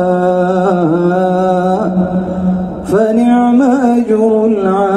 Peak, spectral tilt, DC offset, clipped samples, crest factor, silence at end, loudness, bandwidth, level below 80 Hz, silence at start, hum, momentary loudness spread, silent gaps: 0 dBFS; -8.5 dB/octave; under 0.1%; under 0.1%; 10 dB; 0 s; -12 LUFS; 11.5 kHz; -42 dBFS; 0 s; none; 6 LU; none